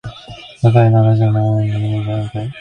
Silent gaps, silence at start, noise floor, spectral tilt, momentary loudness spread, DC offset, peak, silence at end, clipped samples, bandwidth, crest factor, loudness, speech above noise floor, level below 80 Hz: none; 0.05 s; -35 dBFS; -9 dB/octave; 19 LU; under 0.1%; 0 dBFS; 0 s; under 0.1%; 5.6 kHz; 14 dB; -15 LUFS; 22 dB; -44 dBFS